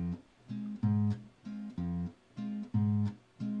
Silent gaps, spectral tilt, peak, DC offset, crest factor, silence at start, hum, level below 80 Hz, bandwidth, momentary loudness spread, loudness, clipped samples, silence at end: none; -10 dB/octave; -20 dBFS; under 0.1%; 14 dB; 0 s; none; -60 dBFS; 6 kHz; 13 LU; -36 LUFS; under 0.1%; 0 s